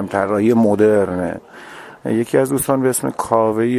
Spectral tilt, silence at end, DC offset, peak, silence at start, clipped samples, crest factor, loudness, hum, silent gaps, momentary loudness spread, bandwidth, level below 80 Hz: -6 dB/octave; 0 s; under 0.1%; 0 dBFS; 0 s; under 0.1%; 16 dB; -17 LUFS; none; none; 17 LU; 16 kHz; -50 dBFS